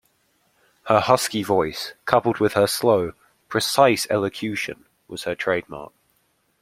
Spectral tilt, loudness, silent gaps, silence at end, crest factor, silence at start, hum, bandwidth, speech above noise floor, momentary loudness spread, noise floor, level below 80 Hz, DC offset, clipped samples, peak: -4 dB/octave; -21 LUFS; none; 0.75 s; 22 dB; 0.85 s; none; 16.5 kHz; 46 dB; 14 LU; -67 dBFS; -58 dBFS; under 0.1%; under 0.1%; 0 dBFS